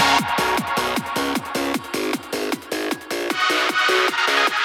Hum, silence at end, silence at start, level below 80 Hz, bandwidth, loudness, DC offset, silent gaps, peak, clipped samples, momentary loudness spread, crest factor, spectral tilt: none; 0 s; 0 s; -52 dBFS; 19 kHz; -21 LUFS; under 0.1%; none; -4 dBFS; under 0.1%; 8 LU; 16 dB; -2.5 dB/octave